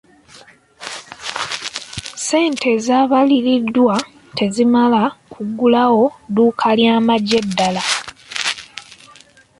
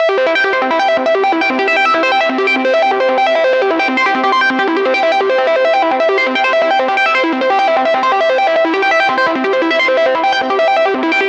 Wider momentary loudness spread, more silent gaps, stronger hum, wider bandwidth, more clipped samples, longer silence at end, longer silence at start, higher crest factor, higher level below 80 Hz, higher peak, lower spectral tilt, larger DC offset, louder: first, 15 LU vs 2 LU; neither; neither; first, 11.5 kHz vs 8.4 kHz; neither; first, 0.65 s vs 0 s; first, 0.35 s vs 0 s; first, 16 dB vs 10 dB; first, -56 dBFS vs -66 dBFS; about the same, 0 dBFS vs -2 dBFS; about the same, -4 dB/octave vs -3 dB/octave; neither; second, -16 LUFS vs -12 LUFS